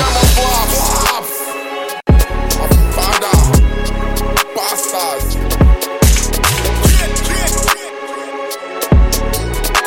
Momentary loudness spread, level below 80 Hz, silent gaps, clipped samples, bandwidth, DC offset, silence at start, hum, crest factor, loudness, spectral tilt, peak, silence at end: 10 LU; -16 dBFS; none; under 0.1%; 17 kHz; under 0.1%; 0 s; none; 12 dB; -14 LUFS; -4 dB/octave; 0 dBFS; 0 s